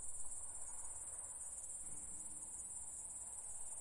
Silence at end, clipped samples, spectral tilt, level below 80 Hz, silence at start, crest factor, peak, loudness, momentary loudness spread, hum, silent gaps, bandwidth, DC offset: 0 s; under 0.1%; -1.5 dB/octave; -68 dBFS; 0 s; 16 dB; -32 dBFS; -46 LUFS; 1 LU; none; none; 11.5 kHz; under 0.1%